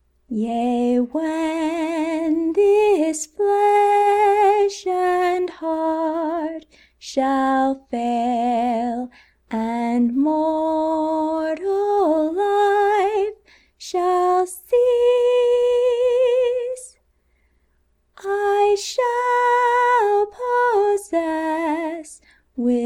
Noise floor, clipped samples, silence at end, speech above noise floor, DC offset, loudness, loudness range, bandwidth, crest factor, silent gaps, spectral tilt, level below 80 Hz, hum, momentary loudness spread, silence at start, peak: -64 dBFS; under 0.1%; 0 s; 44 dB; under 0.1%; -20 LUFS; 4 LU; 15 kHz; 12 dB; none; -4 dB/octave; -58 dBFS; none; 10 LU; 0.3 s; -8 dBFS